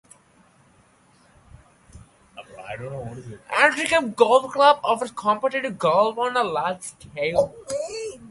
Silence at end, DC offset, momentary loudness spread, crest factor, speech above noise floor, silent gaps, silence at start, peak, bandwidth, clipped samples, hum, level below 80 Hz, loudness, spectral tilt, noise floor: 0 s; under 0.1%; 18 LU; 22 dB; 36 dB; none; 1.95 s; -2 dBFS; 11.5 kHz; under 0.1%; none; -58 dBFS; -21 LUFS; -3.5 dB/octave; -57 dBFS